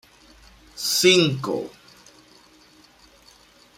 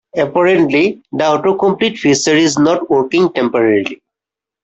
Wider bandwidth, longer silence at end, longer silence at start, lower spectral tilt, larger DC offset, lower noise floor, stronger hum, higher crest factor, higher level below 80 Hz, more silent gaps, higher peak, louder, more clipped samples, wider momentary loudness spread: first, 16 kHz vs 8.4 kHz; first, 2.1 s vs 0.7 s; first, 0.75 s vs 0.15 s; about the same, -3.5 dB/octave vs -4.5 dB/octave; neither; second, -53 dBFS vs -86 dBFS; neither; first, 22 dB vs 12 dB; second, -60 dBFS vs -54 dBFS; neither; about the same, -4 dBFS vs -2 dBFS; second, -19 LUFS vs -13 LUFS; neither; first, 21 LU vs 6 LU